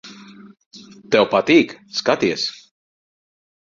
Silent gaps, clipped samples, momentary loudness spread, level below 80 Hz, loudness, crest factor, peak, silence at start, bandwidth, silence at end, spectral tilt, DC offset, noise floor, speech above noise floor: 0.66-0.71 s; under 0.1%; 10 LU; -62 dBFS; -18 LUFS; 20 dB; -2 dBFS; 0.05 s; 7.6 kHz; 1.15 s; -4.5 dB/octave; under 0.1%; -41 dBFS; 24 dB